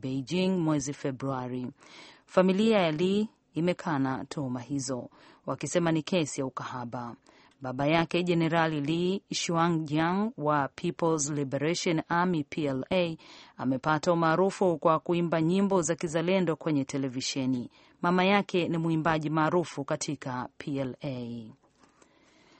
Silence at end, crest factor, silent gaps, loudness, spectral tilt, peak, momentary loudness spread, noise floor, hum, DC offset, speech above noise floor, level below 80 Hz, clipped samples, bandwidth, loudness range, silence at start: 1.1 s; 20 dB; none; -29 LUFS; -5.5 dB/octave; -8 dBFS; 11 LU; -62 dBFS; none; under 0.1%; 34 dB; -64 dBFS; under 0.1%; 8.8 kHz; 4 LU; 0.05 s